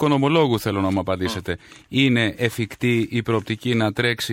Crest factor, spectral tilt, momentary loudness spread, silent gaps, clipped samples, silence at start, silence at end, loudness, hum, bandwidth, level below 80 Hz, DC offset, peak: 16 dB; -6 dB/octave; 8 LU; none; under 0.1%; 0 s; 0 s; -21 LUFS; none; 16.5 kHz; -52 dBFS; under 0.1%; -4 dBFS